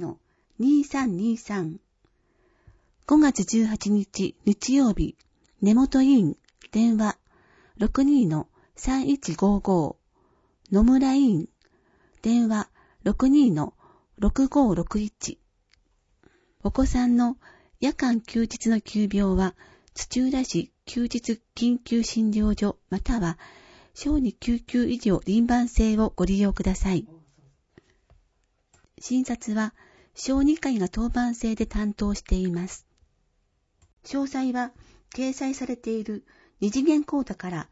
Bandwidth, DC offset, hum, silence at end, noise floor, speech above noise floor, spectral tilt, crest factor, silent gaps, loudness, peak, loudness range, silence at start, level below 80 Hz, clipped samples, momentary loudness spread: 8 kHz; under 0.1%; none; 0.1 s; -70 dBFS; 47 dB; -6 dB/octave; 16 dB; none; -24 LUFS; -8 dBFS; 7 LU; 0 s; -38 dBFS; under 0.1%; 12 LU